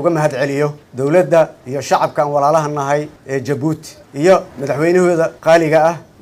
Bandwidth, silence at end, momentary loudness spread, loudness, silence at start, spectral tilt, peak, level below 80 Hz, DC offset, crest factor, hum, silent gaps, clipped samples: 15.5 kHz; 0.2 s; 10 LU; -15 LUFS; 0 s; -6 dB/octave; 0 dBFS; -56 dBFS; under 0.1%; 14 dB; none; none; under 0.1%